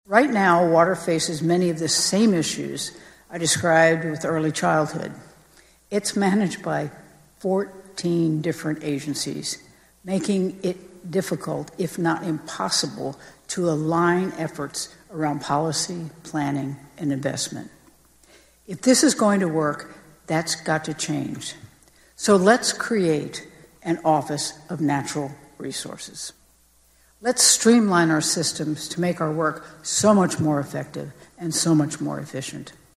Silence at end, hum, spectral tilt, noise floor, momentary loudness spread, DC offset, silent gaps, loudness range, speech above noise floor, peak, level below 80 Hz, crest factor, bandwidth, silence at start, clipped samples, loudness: 0.25 s; none; -4 dB/octave; -58 dBFS; 16 LU; under 0.1%; none; 6 LU; 36 dB; -2 dBFS; -60 dBFS; 22 dB; 15 kHz; 0.1 s; under 0.1%; -22 LUFS